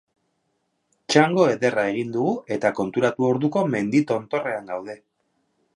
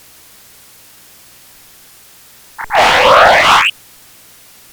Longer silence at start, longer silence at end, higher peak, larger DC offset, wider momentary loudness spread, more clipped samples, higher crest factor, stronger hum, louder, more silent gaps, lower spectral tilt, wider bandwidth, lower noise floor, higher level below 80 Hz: second, 1.1 s vs 2.6 s; second, 0.8 s vs 1 s; about the same, -2 dBFS vs 0 dBFS; neither; about the same, 11 LU vs 10 LU; second, under 0.1% vs 0.2%; first, 22 dB vs 14 dB; second, none vs 60 Hz at -55 dBFS; second, -22 LUFS vs -8 LUFS; neither; first, -5.5 dB/octave vs -1.5 dB/octave; second, 11 kHz vs over 20 kHz; first, -73 dBFS vs -42 dBFS; second, -68 dBFS vs -42 dBFS